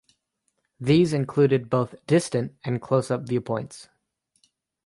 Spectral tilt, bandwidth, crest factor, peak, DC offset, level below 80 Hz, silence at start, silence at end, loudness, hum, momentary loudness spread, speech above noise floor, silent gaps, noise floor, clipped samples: -7 dB/octave; 11.5 kHz; 18 dB; -8 dBFS; under 0.1%; -60 dBFS; 0.8 s; 1.05 s; -24 LUFS; none; 11 LU; 52 dB; none; -75 dBFS; under 0.1%